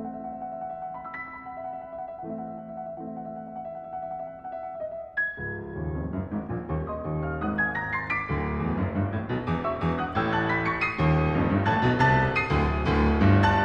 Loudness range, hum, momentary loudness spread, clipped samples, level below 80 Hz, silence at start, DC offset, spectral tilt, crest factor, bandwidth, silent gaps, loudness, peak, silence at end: 13 LU; none; 15 LU; under 0.1%; -40 dBFS; 0 s; under 0.1%; -8 dB/octave; 18 dB; 7.8 kHz; none; -28 LUFS; -8 dBFS; 0 s